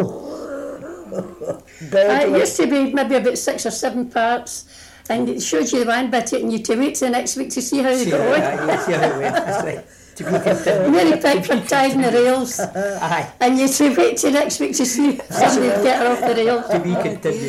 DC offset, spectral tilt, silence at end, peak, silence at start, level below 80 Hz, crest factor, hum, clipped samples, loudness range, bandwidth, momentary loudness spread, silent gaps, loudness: under 0.1%; -4 dB/octave; 0 s; -4 dBFS; 0 s; -56 dBFS; 14 dB; none; under 0.1%; 4 LU; 16 kHz; 14 LU; none; -18 LUFS